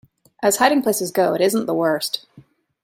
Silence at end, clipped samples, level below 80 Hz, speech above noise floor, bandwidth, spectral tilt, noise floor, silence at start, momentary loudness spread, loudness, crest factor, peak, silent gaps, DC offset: 0.45 s; under 0.1%; -66 dBFS; 32 dB; 16.5 kHz; -3.5 dB/octave; -50 dBFS; 0.4 s; 7 LU; -19 LUFS; 18 dB; -2 dBFS; none; under 0.1%